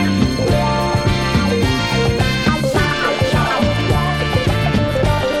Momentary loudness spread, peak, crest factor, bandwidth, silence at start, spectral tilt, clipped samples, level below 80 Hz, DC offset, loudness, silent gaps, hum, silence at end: 1 LU; -2 dBFS; 14 dB; 16 kHz; 0 s; -5.5 dB/octave; under 0.1%; -28 dBFS; under 0.1%; -16 LUFS; none; none; 0 s